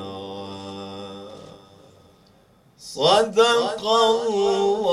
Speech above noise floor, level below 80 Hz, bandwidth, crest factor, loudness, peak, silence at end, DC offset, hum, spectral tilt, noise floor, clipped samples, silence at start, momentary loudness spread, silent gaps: 37 dB; -62 dBFS; 12.5 kHz; 18 dB; -19 LUFS; -4 dBFS; 0 s; under 0.1%; none; -3.5 dB/octave; -56 dBFS; under 0.1%; 0 s; 20 LU; none